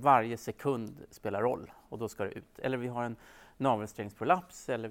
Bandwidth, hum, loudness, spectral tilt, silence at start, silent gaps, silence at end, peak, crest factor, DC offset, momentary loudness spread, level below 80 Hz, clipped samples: 16.5 kHz; none; -34 LUFS; -6 dB/octave; 0 s; none; 0 s; -12 dBFS; 22 dB; under 0.1%; 11 LU; -66 dBFS; under 0.1%